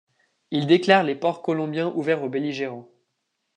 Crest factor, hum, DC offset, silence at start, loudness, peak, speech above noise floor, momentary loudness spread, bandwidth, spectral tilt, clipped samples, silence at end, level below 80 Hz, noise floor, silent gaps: 22 dB; none; under 0.1%; 0.5 s; -23 LUFS; -2 dBFS; 55 dB; 12 LU; 9.4 kHz; -6.5 dB/octave; under 0.1%; 0.75 s; -76 dBFS; -77 dBFS; none